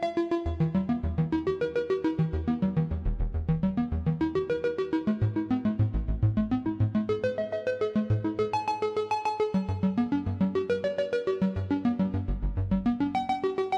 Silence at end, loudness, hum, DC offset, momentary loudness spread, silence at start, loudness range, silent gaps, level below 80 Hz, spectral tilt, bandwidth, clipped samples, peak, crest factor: 0 s; -29 LUFS; none; under 0.1%; 2 LU; 0 s; 1 LU; none; -38 dBFS; -8.5 dB/octave; 8.2 kHz; under 0.1%; -14 dBFS; 12 dB